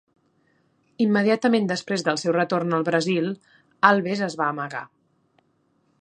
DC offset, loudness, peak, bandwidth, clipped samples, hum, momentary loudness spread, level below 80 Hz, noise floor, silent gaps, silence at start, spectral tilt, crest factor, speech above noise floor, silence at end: under 0.1%; -22 LUFS; 0 dBFS; 9.6 kHz; under 0.1%; none; 11 LU; -74 dBFS; -67 dBFS; none; 1 s; -5.5 dB/octave; 24 dB; 45 dB; 1.15 s